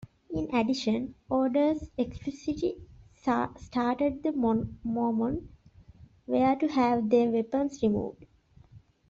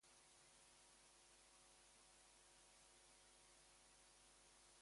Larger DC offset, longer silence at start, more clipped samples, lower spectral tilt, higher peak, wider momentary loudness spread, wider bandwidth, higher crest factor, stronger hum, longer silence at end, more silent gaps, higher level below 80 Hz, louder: neither; about the same, 0 s vs 0 s; neither; first, -6.5 dB/octave vs -1 dB/octave; first, -12 dBFS vs -56 dBFS; first, 9 LU vs 0 LU; second, 7.6 kHz vs 11.5 kHz; about the same, 18 dB vs 14 dB; second, none vs 50 Hz at -85 dBFS; first, 0.3 s vs 0 s; neither; first, -54 dBFS vs -84 dBFS; first, -29 LUFS vs -69 LUFS